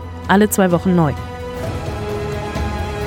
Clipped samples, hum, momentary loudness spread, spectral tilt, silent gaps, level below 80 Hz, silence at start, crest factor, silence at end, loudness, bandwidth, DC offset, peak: under 0.1%; none; 11 LU; -6 dB/octave; none; -32 dBFS; 0 s; 18 dB; 0 s; -18 LUFS; 17.5 kHz; under 0.1%; 0 dBFS